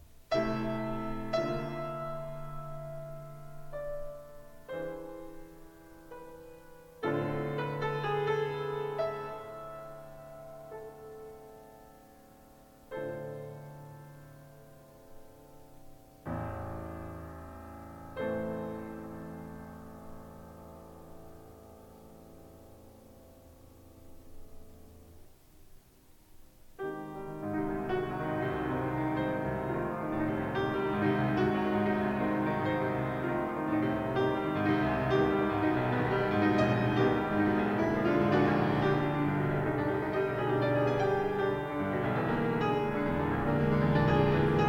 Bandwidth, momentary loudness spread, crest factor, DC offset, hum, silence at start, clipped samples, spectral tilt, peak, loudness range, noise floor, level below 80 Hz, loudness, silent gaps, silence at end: 17 kHz; 22 LU; 18 dB; under 0.1%; none; 0 s; under 0.1%; -8 dB/octave; -14 dBFS; 18 LU; -59 dBFS; -52 dBFS; -31 LUFS; none; 0 s